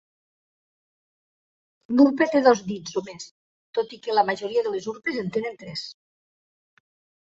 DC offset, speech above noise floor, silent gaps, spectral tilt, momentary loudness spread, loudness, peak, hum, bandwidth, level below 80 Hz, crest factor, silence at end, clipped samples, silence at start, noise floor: under 0.1%; over 67 dB; 3.31-3.73 s; -5 dB/octave; 16 LU; -24 LUFS; -4 dBFS; none; 8 kHz; -68 dBFS; 22 dB; 1.3 s; under 0.1%; 1.9 s; under -90 dBFS